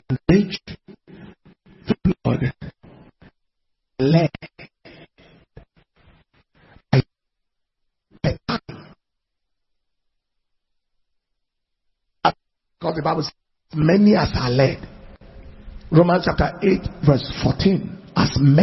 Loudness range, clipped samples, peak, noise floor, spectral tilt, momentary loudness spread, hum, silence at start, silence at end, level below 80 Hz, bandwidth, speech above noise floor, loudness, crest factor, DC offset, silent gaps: 13 LU; under 0.1%; 0 dBFS; -77 dBFS; -8 dB/octave; 24 LU; none; 0.1 s; 0 s; -42 dBFS; 6 kHz; 60 dB; -20 LUFS; 22 dB; under 0.1%; none